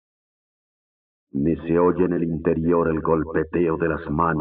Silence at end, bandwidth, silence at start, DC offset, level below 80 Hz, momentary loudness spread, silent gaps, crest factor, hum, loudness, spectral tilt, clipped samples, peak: 0 s; 4 kHz; 1.35 s; under 0.1%; -46 dBFS; 4 LU; none; 16 dB; none; -22 LUFS; -9 dB/octave; under 0.1%; -6 dBFS